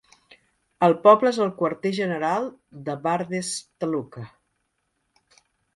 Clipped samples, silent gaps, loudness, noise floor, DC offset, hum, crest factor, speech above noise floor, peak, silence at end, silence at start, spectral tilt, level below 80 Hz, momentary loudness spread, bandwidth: under 0.1%; none; -23 LUFS; -74 dBFS; under 0.1%; none; 22 dB; 52 dB; -2 dBFS; 1.5 s; 0.8 s; -5 dB/octave; -68 dBFS; 19 LU; 11.5 kHz